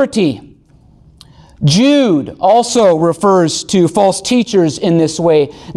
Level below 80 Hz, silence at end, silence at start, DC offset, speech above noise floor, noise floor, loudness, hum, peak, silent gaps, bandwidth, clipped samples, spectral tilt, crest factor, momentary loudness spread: -48 dBFS; 0.05 s; 0 s; under 0.1%; 34 dB; -45 dBFS; -12 LUFS; none; -2 dBFS; none; 12.5 kHz; under 0.1%; -5.5 dB/octave; 10 dB; 5 LU